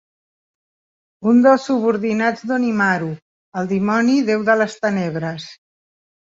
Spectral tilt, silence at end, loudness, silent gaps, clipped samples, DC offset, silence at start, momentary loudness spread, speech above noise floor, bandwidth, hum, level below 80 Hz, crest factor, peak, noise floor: -6.5 dB/octave; 0.8 s; -18 LUFS; 3.22-3.52 s; under 0.1%; under 0.1%; 1.2 s; 14 LU; over 73 dB; 7.8 kHz; none; -62 dBFS; 16 dB; -2 dBFS; under -90 dBFS